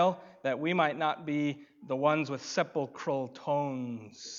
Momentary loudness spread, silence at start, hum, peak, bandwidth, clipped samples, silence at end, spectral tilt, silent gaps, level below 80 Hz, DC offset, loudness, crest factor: 9 LU; 0 s; none; -12 dBFS; 7.6 kHz; under 0.1%; 0 s; -5.5 dB/octave; none; -84 dBFS; under 0.1%; -32 LUFS; 20 dB